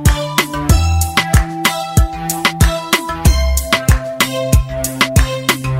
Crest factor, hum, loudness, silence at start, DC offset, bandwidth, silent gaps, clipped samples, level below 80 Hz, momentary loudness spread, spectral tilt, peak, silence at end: 14 dB; none; -15 LUFS; 0 s; under 0.1%; 16.5 kHz; none; under 0.1%; -18 dBFS; 3 LU; -4 dB/octave; 0 dBFS; 0 s